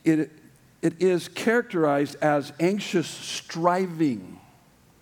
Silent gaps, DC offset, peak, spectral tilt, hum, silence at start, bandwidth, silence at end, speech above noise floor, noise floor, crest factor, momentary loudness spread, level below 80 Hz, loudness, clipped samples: none; under 0.1%; -6 dBFS; -5.5 dB/octave; none; 0.05 s; 18 kHz; 0.65 s; 33 dB; -57 dBFS; 18 dB; 8 LU; -72 dBFS; -25 LUFS; under 0.1%